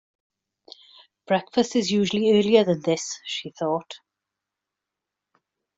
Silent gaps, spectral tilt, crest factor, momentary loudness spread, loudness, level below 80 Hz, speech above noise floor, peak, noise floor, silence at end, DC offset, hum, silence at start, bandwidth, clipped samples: none; -4.5 dB/octave; 22 dB; 12 LU; -23 LUFS; -68 dBFS; 64 dB; -4 dBFS; -86 dBFS; 1.8 s; under 0.1%; none; 1.3 s; 8 kHz; under 0.1%